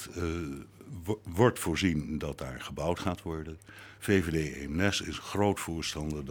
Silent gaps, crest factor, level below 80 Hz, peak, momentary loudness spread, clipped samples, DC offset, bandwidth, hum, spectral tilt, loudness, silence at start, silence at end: none; 22 dB; -50 dBFS; -10 dBFS; 14 LU; under 0.1%; under 0.1%; 19.5 kHz; none; -5 dB/octave; -32 LUFS; 0 s; 0 s